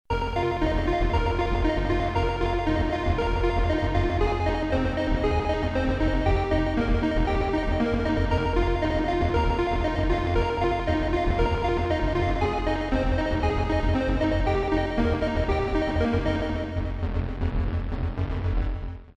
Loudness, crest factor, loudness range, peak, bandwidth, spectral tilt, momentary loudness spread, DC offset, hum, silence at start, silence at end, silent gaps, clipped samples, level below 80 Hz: -26 LUFS; 14 dB; 1 LU; -10 dBFS; 8.2 kHz; -7.5 dB/octave; 4 LU; under 0.1%; none; 0.1 s; 0.1 s; none; under 0.1%; -28 dBFS